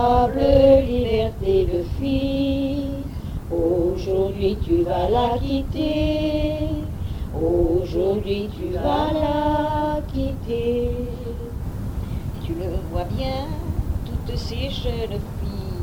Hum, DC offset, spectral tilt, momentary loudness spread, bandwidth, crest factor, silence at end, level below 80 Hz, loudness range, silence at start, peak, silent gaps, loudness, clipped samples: none; under 0.1%; -8 dB/octave; 10 LU; 17 kHz; 18 dB; 0 s; -30 dBFS; 6 LU; 0 s; -4 dBFS; none; -23 LUFS; under 0.1%